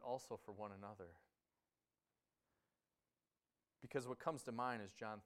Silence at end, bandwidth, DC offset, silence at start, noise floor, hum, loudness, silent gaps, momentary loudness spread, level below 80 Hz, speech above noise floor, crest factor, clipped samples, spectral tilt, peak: 0 s; 15.5 kHz; under 0.1%; 0 s; under -90 dBFS; none; -49 LUFS; none; 13 LU; -86 dBFS; over 41 dB; 26 dB; under 0.1%; -5 dB/octave; -26 dBFS